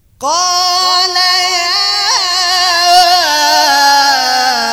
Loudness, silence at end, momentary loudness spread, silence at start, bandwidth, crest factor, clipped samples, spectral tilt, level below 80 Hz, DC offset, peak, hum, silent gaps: -9 LUFS; 0 s; 4 LU; 0.2 s; 17.5 kHz; 10 dB; 0.2%; 1.5 dB/octave; -50 dBFS; under 0.1%; 0 dBFS; none; none